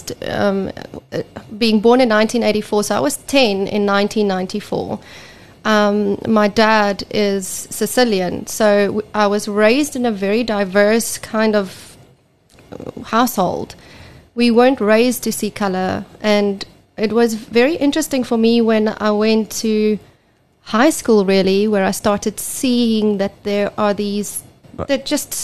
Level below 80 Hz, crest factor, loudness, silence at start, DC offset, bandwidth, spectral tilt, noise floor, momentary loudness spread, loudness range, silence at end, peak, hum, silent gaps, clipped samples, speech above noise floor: -50 dBFS; 16 dB; -16 LUFS; 0 s; 0.8%; 13 kHz; -4.5 dB/octave; -56 dBFS; 11 LU; 3 LU; 0 s; -2 dBFS; none; none; under 0.1%; 40 dB